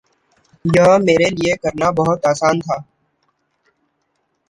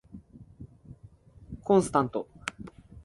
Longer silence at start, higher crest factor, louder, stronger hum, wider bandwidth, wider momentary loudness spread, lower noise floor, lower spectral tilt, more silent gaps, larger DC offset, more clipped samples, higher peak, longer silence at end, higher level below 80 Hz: first, 0.65 s vs 0.15 s; second, 16 dB vs 22 dB; first, -16 LUFS vs -28 LUFS; neither; about the same, 11.5 kHz vs 11.5 kHz; second, 12 LU vs 26 LU; first, -68 dBFS vs -54 dBFS; about the same, -5.5 dB/octave vs -6 dB/octave; neither; neither; neither; first, -2 dBFS vs -10 dBFS; first, 1.65 s vs 0.05 s; first, -48 dBFS vs -56 dBFS